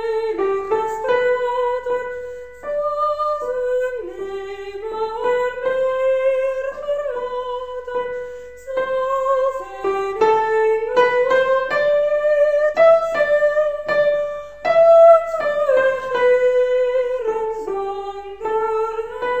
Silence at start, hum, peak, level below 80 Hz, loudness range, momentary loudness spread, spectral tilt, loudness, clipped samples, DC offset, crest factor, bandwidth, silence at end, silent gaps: 0 s; none; -2 dBFS; -52 dBFS; 8 LU; 13 LU; -4 dB/octave; -19 LUFS; under 0.1%; 0.5%; 16 dB; 15 kHz; 0 s; none